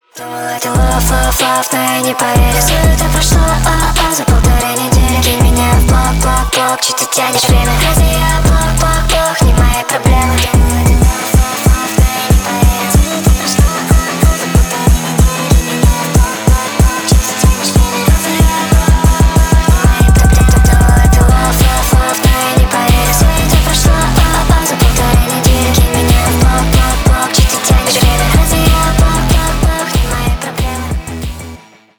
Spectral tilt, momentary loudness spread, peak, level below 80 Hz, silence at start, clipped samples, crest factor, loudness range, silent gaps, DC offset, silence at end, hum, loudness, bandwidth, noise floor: -4.5 dB/octave; 3 LU; 0 dBFS; -12 dBFS; 0.15 s; under 0.1%; 8 dB; 2 LU; none; 0.8%; 0.4 s; none; -11 LUFS; over 20 kHz; -34 dBFS